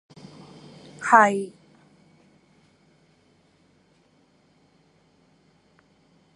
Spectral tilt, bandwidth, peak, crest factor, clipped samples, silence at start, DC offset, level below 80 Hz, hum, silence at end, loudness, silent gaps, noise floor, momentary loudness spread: -4.5 dB/octave; 11 kHz; -2 dBFS; 28 dB; under 0.1%; 1 s; under 0.1%; -76 dBFS; none; 4.85 s; -19 LUFS; none; -62 dBFS; 30 LU